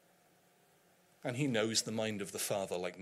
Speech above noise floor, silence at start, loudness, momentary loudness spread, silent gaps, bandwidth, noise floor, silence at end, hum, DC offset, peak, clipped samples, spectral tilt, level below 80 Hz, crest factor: 33 dB; 1.25 s; -36 LUFS; 8 LU; none; 16 kHz; -69 dBFS; 0 s; none; under 0.1%; -18 dBFS; under 0.1%; -3.5 dB/octave; -82 dBFS; 22 dB